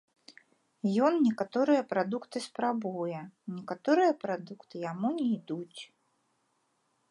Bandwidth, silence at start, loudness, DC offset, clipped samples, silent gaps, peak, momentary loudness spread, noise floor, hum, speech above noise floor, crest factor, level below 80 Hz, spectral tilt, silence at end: 11 kHz; 0.85 s; -31 LUFS; under 0.1%; under 0.1%; none; -14 dBFS; 16 LU; -75 dBFS; none; 45 dB; 18 dB; -84 dBFS; -6.5 dB/octave; 1.25 s